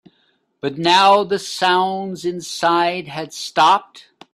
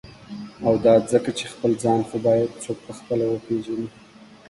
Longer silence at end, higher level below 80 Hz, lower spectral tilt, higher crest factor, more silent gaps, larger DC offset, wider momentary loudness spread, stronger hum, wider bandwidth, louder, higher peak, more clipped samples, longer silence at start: about the same, 0.35 s vs 0.25 s; second, -66 dBFS vs -56 dBFS; second, -3.5 dB/octave vs -6 dB/octave; about the same, 18 dB vs 18 dB; neither; neither; second, 14 LU vs 17 LU; neither; first, 14 kHz vs 11.5 kHz; first, -17 LUFS vs -22 LUFS; first, 0 dBFS vs -4 dBFS; neither; first, 0.65 s vs 0.05 s